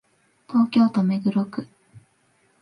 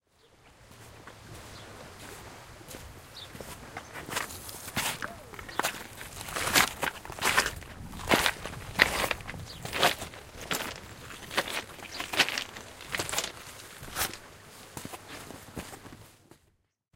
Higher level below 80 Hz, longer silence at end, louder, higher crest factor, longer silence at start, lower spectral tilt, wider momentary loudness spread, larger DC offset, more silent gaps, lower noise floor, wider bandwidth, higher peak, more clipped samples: second, -70 dBFS vs -54 dBFS; first, 0.95 s vs 0.6 s; first, -22 LUFS vs -30 LUFS; second, 16 dB vs 34 dB; about the same, 0.5 s vs 0.45 s; first, -8.5 dB/octave vs -2 dB/octave; second, 11 LU vs 21 LU; neither; neither; second, -64 dBFS vs -70 dBFS; second, 5.8 kHz vs 17 kHz; second, -8 dBFS vs -2 dBFS; neither